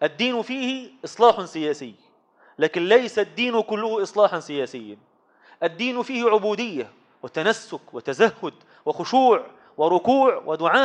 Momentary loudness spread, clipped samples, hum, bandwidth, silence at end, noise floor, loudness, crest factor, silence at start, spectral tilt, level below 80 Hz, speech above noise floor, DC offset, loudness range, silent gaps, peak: 15 LU; under 0.1%; none; 9.4 kHz; 0 s; -57 dBFS; -22 LUFS; 20 dB; 0 s; -4.5 dB/octave; -72 dBFS; 36 dB; under 0.1%; 4 LU; none; -4 dBFS